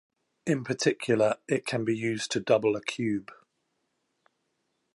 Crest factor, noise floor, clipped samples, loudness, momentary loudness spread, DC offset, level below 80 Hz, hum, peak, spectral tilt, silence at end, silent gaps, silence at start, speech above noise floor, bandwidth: 20 dB; -78 dBFS; under 0.1%; -28 LUFS; 6 LU; under 0.1%; -72 dBFS; none; -10 dBFS; -5 dB/octave; 1.6 s; none; 0.45 s; 50 dB; 11.5 kHz